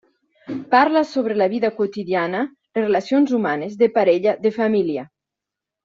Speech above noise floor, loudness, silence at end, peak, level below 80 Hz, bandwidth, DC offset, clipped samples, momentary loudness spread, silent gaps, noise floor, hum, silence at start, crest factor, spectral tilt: 67 dB; -19 LUFS; 0.8 s; -4 dBFS; -66 dBFS; 7.6 kHz; under 0.1%; under 0.1%; 9 LU; none; -85 dBFS; none; 0.5 s; 16 dB; -6.5 dB/octave